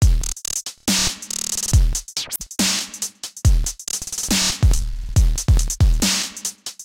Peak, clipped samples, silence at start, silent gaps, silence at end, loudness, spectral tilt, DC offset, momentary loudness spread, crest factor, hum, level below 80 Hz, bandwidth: -4 dBFS; under 0.1%; 0 s; none; 0 s; -20 LUFS; -3 dB/octave; under 0.1%; 8 LU; 14 dB; none; -22 dBFS; 17 kHz